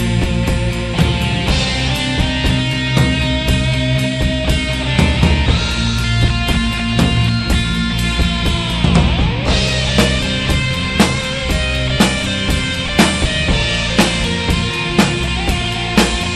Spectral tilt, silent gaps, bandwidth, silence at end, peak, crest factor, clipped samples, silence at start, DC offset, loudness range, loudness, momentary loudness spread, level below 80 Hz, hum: -4.5 dB/octave; none; 13 kHz; 0 s; 0 dBFS; 14 dB; under 0.1%; 0 s; under 0.1%; 1 LU; -15 LUFS; 3 LU; -22 dBFS; none